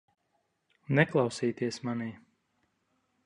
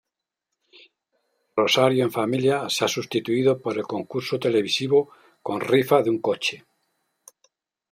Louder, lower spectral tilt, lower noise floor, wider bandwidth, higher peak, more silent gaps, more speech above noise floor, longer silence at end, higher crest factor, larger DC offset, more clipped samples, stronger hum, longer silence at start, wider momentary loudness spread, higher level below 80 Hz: second, -30 LUFS vs -23 LUFS; first, -6 dB/octave vs -4.5 dB/octave; second, -77 dBFS vs -84 dBFS; second, 11 kHz vs 16 kHz; second, -10 dBFS vs -4 dBFS; neither; second, 48 dB vs 62 dB; second, 1.1 s vs 1.35 s; about the same, 24 dB vs 20 dB; neither; neither; neither; second, 0.9 s vs 1.55 s; about the same, 11 LU vs 10 LU; about the same, -70 dBFS vs -70 dBFS